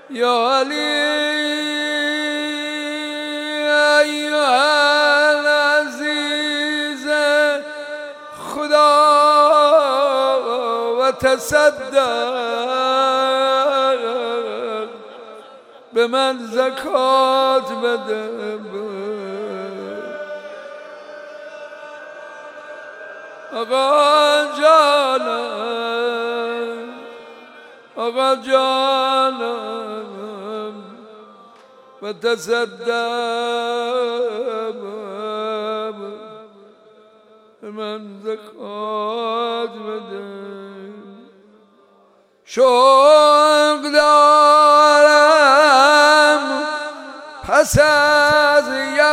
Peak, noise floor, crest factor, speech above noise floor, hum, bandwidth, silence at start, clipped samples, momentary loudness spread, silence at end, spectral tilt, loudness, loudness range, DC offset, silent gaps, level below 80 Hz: -2 dBFS; -54 dBFS; 16 dB; 38 dB; none; 16 kHz; 0.1 s; under 0.1%; 23 LU; 0 s; -2.5 dB/octave; -16 LUFS; 17 LU; under 0.1%; none; -52 dBFS